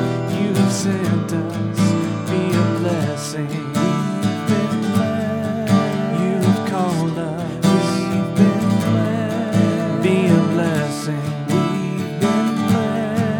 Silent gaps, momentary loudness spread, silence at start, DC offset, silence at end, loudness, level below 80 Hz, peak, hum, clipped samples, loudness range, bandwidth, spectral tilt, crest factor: none; 6 LU; 0 s; under 0.1%; 0 s; -19 LUFS; -56 dBFS; -2 dBFS; none; under 0.1%; 2 LU; 18.5 kHz; -6.5 dB/octave; 16 dB